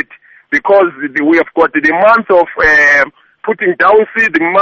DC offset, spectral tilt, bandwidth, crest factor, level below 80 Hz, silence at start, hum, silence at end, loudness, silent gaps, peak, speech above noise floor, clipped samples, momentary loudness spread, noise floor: under 0.1%; -5 dB/octave; 7.6 kHz; 10 dB; -42 dBFS; 0.5 s; none; 0 s; -9 LUFS; none; 0 dBFS; 32 dB; under 0.1%; 9 LU; -41 dBFS